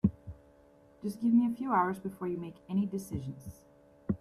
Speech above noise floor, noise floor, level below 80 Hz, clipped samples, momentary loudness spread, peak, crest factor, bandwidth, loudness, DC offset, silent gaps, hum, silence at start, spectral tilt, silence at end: 29 dB; -61 dBFS; -58 dBFS; under 0.1%; 20 LU; -14 dBFS; 20 dB; 13.5 kHz; -33 LUFS; under 0.1%; none; none; 0.05 s; -8 dB/octave; 0.05 s